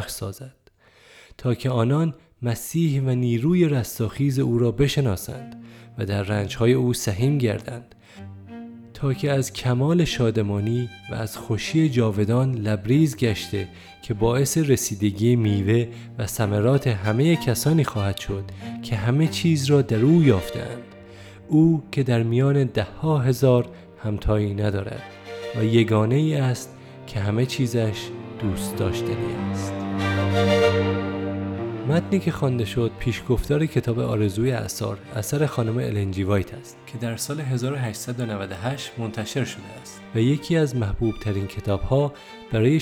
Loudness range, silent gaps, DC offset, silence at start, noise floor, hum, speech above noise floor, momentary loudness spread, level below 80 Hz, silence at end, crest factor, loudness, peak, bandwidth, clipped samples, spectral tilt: 5 LU; none; under 0.1%; 0 s; -54 dBFS; none; 32 dB; 14 LU; -44 dBFS; 0 s; 18 dB; -23 LUFS; -4 dBFS; 17.5 kHz; under 0.1%; -6.5 dB/octave